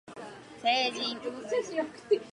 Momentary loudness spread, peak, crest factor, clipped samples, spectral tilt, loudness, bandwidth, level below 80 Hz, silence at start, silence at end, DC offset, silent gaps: 18 LU; -14 dBFS; 18 dB; under 0.1%; -2.5 dB/octave; -31 LUFS; 11.5 kHz; -74 dBFS; 0.05 s; 0 s; under 0.1%; none